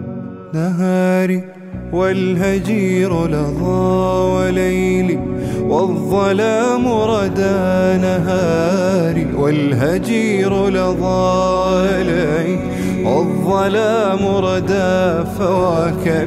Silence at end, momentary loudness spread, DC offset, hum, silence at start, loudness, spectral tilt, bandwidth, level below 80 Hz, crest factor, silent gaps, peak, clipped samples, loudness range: 0 s; 4 LU; under 0.1%; none; 0 s; -16 LUFS; -7 dB/octave; 14.5 kHz; -36 dBFS; 12 dB; none; -4 dBFS; under 0.1%; 1 LU